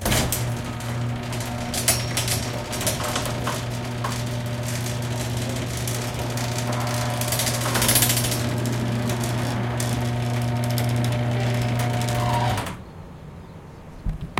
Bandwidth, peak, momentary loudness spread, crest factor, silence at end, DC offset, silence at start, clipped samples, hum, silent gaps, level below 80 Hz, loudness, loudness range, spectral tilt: 17 kHz; -4 dBFS; 9 LU; 22 dB; 0 s; under 0.1%; 0 s; under 0.1%; none; none; -40 dBFS; -24 LUFS; 4 LU; -4 dB/octave